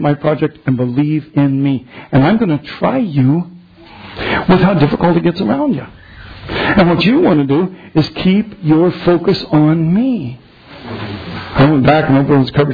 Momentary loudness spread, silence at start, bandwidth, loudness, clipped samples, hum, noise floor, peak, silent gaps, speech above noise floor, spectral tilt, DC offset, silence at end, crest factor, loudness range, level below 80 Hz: 13 LU; 0 s; 5 kHz; -13 LUFS; under 0.1%; none; -37 dBFS; -2 dBFS; none; 25 dB; -9.5 dB/octave; under 0.1%; 0 s; 12 dB; 2 LU; -38 dBFS